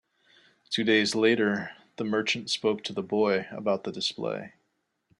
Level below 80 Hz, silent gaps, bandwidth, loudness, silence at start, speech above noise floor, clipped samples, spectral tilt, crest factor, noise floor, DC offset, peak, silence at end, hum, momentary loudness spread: -72 dBFS; none; 11.5 kHz; -27 LUFS; 0.7 s; 50 dB; under 0.1%; -4 dB/octave; 18 dB; -77 dBFS; under 0.1%; -10 dBFS; 0.7 s; none; 11 LU